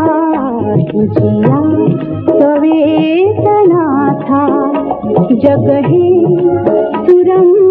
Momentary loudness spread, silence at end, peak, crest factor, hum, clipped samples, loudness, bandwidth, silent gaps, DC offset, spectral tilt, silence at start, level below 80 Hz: 5 LU; 0 s; 0 dBFS; 10 dB; none; 0.3%; -10 LUFS; 4 kHz; none; under 0.1%; -11 dB/octave; 0 s; -46 dBFS